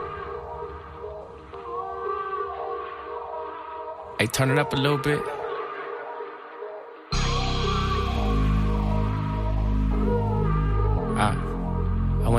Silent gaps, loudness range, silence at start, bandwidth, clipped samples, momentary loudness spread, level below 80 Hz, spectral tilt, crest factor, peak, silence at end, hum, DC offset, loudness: none; 8 LU; 0 s; 15 kHz; under 0.1%; 15 LU; -30 dBFS; -6 dB/octave; 22 dB; -4 dBFS; 0 s; none; under 0.1%; -27 LUFS